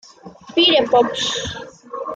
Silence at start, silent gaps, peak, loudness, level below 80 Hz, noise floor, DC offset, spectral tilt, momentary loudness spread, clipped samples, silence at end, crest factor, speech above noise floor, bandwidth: 0.25 s; none; -4 dBFS; -16 LUFS; -52 dBFS; -41 dBFS; under 0.1%; -3 dB/octave; 18 LU; under 0.1%; 0 s; 16 dB; 24 dB; 9.2 kHz